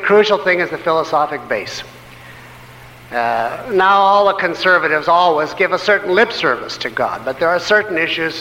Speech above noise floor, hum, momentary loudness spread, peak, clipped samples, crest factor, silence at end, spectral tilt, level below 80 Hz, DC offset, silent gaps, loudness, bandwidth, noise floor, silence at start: 23 dB; none; 9 LU; -2 dBFS; under 0.1%; 14 dB; 0 s; -4 dB/octave; -52 dBFS; under 0.1%; none; -15 LUFS; 16.5 kHz; -38 dBFS; 0 s